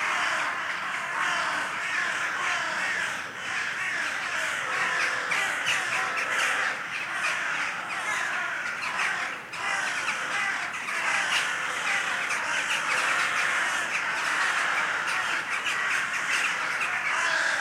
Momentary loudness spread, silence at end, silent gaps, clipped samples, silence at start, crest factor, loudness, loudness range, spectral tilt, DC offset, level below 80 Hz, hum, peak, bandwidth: 5 LU; 0 s; none; under 0.1%; 0 s; 16 dB; -26 LUFS; 3 LU; 0 dB/octave; under 0.1%; -74 dBFS; none; -12 dBFS; 16.5 kHz